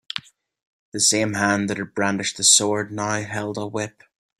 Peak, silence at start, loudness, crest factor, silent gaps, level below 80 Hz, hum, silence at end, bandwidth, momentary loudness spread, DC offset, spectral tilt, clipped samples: 0 dBFS; 0.15 s; -20 LUFS; 24 dB; 0.66-0.92 s; -62 dBFS; none; 0.5 s; 15.5 kHz; 17 LU; under 0.1%; -2 dB/octave; under 0.1%